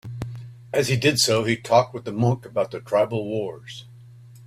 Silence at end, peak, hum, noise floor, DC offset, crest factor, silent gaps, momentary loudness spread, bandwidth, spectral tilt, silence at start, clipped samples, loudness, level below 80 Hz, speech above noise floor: 0 s; -4 dBFS; none; -45 dBFS; under 0.1%; 20 dB; none; 17 LU; 15.5 kHz; -4.5 dB/octave; 0.05 s; under 0.1%; -22 LUFS; -56 dBFS; 23 dB